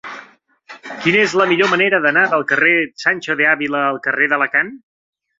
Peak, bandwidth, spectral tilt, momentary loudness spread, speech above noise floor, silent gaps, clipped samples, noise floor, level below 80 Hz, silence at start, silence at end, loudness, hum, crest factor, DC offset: 0 dBFS; 7.8 kHz; -4.5 dB/octave; 11 LU; 31 dB; none; under 0.1%; -46 dBFS; -64 dBFS; 0.05 s; 0.6 s; -15 LUFS; none; 16 dB; under 0.1%